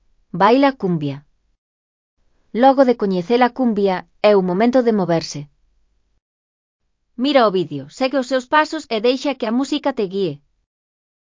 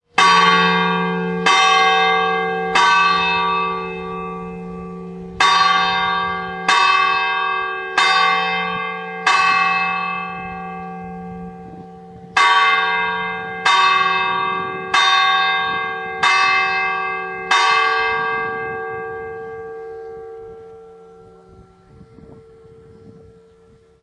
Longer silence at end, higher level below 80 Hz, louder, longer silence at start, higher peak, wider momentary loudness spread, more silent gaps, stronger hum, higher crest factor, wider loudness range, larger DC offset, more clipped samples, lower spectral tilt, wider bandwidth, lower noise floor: about the same, 0.9 s vs 0.85 s; second, -60 dBFS vs -54 dBFS; about the same, -17 LUFS vs -16 LUFS; first, 0.35 s vs 0.15 s; about the same, 0 dBFS vs 0 dBFS; second, 11 LU vs 19 LU; first, 1.58-2.17 s, 6.22-6.79 s vs none; neither; about the same, 18 dB vs 18 dB; second, 4 LU vs 7 LU; neither; neither; first, -6 dB/octave vs -2.5 dB/octave; second, 7.6 kHz vs 11 kHz; first, -61 dBFS vs -50 dBFS